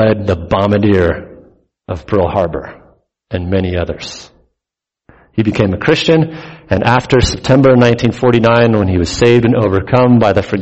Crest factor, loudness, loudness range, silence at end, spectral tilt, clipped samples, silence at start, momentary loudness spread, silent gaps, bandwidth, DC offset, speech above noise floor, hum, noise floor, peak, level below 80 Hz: 12 dB; -12 LUFS; 9 LU; 0 s; -6.5 dB/octave; under 0.1%; 0 s; 15 LU; none; 8.2 kHz; under 0.1%; 71 dB; none; -83 dBFS; 0 dBFS; -32 dBFS